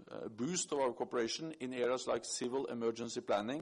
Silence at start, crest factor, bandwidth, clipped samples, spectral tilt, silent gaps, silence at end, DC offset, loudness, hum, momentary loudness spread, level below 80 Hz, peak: 0 s; 14 dB; 11.5 kHz; under 0.1%; -3.5 dB/octave; none; 0 s; under 0.1%; -38 LUFS; none; 6 LU; -76 dBFS; -24 dBFS